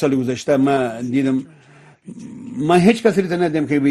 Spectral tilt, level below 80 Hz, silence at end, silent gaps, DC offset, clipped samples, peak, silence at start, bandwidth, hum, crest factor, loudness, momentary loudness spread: -6.5 dB/octave; -56 dBFS; 0 s; none; under 0.1%; under 0.1%; 0 dBFS; 0 s; 12.5 kHz; none; 18 dB; -17 LUFS; 17 LU